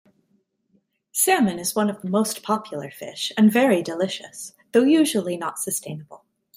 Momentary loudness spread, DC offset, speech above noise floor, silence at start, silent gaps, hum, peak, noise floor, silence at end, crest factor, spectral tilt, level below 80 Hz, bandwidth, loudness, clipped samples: 16 LU; under 0.1%; 46 dB; 1.15 s; none; none; -6 dBFS; -68 dBFS; 0.4 s; 18 dB; -4 dB/octave; -70 dBFS; 16 kHz; -21 LUFS; under 0.1%